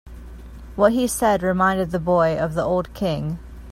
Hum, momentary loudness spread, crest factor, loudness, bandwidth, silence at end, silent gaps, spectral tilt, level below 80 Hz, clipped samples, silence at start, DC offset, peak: none; 20 LU; 18 dB; -21 LUFS; 16.5 kHz; 0 s; none; -5.5 dB/octave; -40 dBFS; under 0.1%; 0.05 s; under 0.1%; -2 dBFS